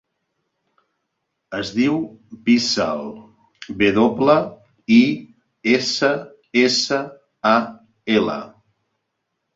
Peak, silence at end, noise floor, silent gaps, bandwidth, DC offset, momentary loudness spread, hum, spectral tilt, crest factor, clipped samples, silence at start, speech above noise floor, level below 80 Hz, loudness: -2 dBFS; 1.05 s; -76 dBFS; none; 7.8 kHz; under 0.1%; 16 LU; none; -4.5 dB/octave; 18 dB; under 0.1%; 1.5 s; 58 dB; -58 dBFS; -19 LUFS